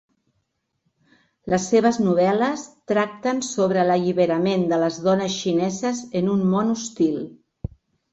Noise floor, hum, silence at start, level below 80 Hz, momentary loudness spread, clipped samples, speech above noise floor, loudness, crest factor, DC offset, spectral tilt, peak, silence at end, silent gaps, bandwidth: -74 dBFS; none; 1.45 s; -52 dBFS; 13 LU; under 0.1%; 53 dB; -21 LUFS; 16 dB; under 0.1%; -5.5 dB/octave; -6 dBFS; 0.45 s; none; 8.2 kHz